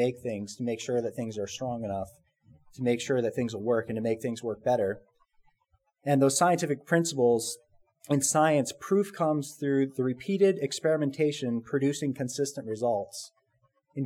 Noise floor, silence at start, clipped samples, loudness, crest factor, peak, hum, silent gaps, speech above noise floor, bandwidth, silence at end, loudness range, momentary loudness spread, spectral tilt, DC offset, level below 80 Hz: -72 dBFS; 0 s; under 0.1%; -28 LUFS; 18 dB; -10 dBFS; none; none; 44 dB; 17 kHz; 0 s; 5 LU; 11 LU; -5 dB/octave; under 0.1%; -70 dBFS